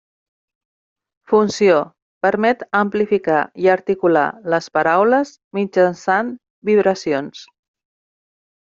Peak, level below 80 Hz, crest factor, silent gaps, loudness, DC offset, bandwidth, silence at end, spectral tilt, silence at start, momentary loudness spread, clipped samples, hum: -2 dBFS; -62 dBFS; 16 dB; 2.02-2.21 s, 5.44-5.51 s, 6.50-6.62 s; -17 LUFS; under 0.1%; 7.6 kHz; 1.3 s; -5.5 dB/octave; 1.3 s; 9 LU; under 0.1%; none